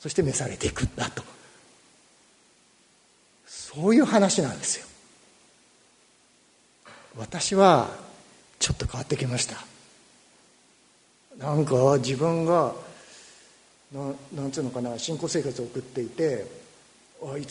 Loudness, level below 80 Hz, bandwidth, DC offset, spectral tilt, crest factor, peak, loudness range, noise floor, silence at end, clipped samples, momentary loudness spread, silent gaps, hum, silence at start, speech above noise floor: -25 LUFS; -50 dBFS; 11 kHz; under 0.1%; -4.5 dB/octave; 24 dB; -4 dBFS; 7 LU; -61 dBFS; 0 s; under 0.1%; 22 LU; none; none; 0 s; 36 dB